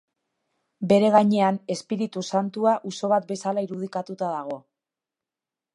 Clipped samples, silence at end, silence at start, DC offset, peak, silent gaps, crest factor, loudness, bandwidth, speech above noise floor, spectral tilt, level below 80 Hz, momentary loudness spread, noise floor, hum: under 0.1%; 1.15 s; 0.8 s; under 0.1%; -4 dBFS; none; 20 dB; -24 LUFS; 11 kHz; 66 dB; -6 dB/octave; -72 dBFS; 13 LU; -90 dBFS; none